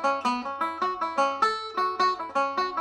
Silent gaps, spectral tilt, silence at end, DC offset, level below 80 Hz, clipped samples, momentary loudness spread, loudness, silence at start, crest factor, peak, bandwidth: none; -2.5 dB/octave; 0 s; under 0.1%; -68 dBFS; under 0.1%; 4 LU; -26 LUFS; 0 s; 16 dB; -12 dBFS; 14 kHz